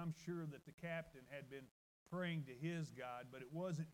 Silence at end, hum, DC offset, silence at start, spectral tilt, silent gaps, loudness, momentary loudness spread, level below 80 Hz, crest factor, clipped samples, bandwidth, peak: 0 s; none; under 0.1%; 0 s; -6.5 dB/octave; 0.74-0.78 s, 1.71-2.06 s; -49 LUFS; 10 LU; -78 dBFS; 14 dB; under 0.1%; 16 kHz; -34 dBFS